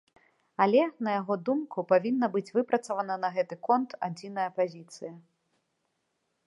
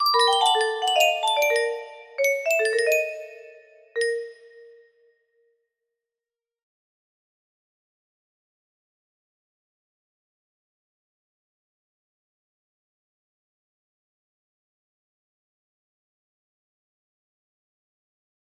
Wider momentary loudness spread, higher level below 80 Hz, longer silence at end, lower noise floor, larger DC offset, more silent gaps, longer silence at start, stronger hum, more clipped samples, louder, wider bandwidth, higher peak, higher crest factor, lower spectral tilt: second, 13 LU vs 17 LU; about the same, -84 dBFS vs -82 dBFS; second, 1.25 s vs 13.95 s; second, -79 dBFS vs under -90 dBFS; neither; neither; first, 0.6 s vs 0 s; neither; neither; second, -29 LUFS vs -22 LUFS; second, 11.5 kHz vs 15.5 kHz; second, -10 dBFS vs -6 dBFS; about the same, 20 dB vs 24 dB; first, -6.5 dB/octave vs 2.5 dB/octave